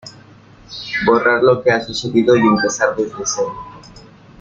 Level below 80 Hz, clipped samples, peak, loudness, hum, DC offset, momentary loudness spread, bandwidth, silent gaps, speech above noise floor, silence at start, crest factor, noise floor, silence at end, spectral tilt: -50 dBFS; under 0.1%; -2 dBFS; -15 LUFS; none; under 0.1%; 17 LU; 7.8 kHz; none; 29 dB; 0.05 s; 16 dB; -43 dBFS; 0.4 s; -4 dB/octave